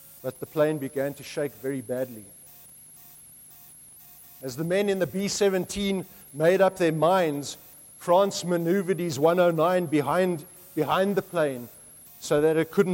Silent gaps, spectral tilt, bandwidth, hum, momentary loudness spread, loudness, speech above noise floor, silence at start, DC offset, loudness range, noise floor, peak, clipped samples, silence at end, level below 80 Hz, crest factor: none; -5.5 dB/octave; 16.5 kHz; none; 24 LU; -25 LUFS; 25 dB; 0.15 s; under 0.1%; 10 LU; -49 dBFS; -8 dBFS; under 0.1%; 0 s; -62 dBFS; 18 dB